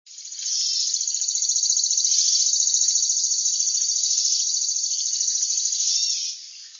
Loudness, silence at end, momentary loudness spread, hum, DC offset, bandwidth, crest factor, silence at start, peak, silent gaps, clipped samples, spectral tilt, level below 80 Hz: -19 LUFS; 0 s; 5 LU; none; under 0.1%; 7.6 kHz; 16 dB; 0.05 s; -6 dBFS; none; under 0.1%; 14 dB/octave; under -90 dBFS